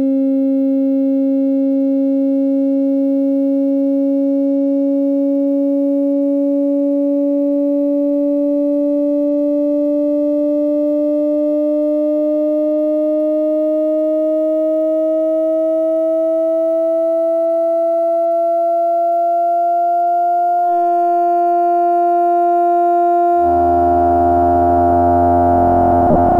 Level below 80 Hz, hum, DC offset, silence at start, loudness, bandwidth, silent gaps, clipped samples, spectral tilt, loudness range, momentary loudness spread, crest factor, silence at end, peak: -40 dBFS; none; under 0.1%; 0 s; -15 LUFS; 3 kHz; none; under 0.1%; -10.5 dB/octave; 3 LU; 3 LU; 12 dB; 0 s; -2 dBFS